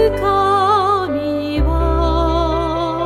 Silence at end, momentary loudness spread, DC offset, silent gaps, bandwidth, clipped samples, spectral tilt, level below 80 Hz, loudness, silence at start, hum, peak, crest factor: 0 s; 6 LU; under 0.1%; none; 13.5 kHz; under 0.1%; -7 dB/octave; -22 dBFS; -16 LUFS; 0 s; none; -2 dBFS; 12 dB